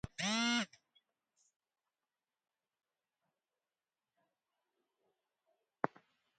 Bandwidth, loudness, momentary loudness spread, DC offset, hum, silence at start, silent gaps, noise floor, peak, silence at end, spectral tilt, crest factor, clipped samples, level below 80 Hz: 9 kHz; -37 LUFS; 9 LU; under 0.1%; none; 0.05 s; 1.56-1.60 s; under -90 dBFS; -14 dBFS; 0.5 s; -2.5 dB/octave; 32 dB; under 0.1%; -72 dBFS